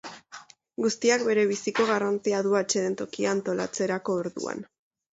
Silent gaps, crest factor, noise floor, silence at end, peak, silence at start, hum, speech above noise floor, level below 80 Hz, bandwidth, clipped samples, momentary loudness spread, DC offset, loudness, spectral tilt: none; 18 dB; -49 dBFS; 0.5 s; -8 dBFS; 0.05 s; none; 23 dB; -72 dBFS; 8 kHz; under 0.1%; 17 LU; under 0.1%; -26 LUFS; -4 dB/octave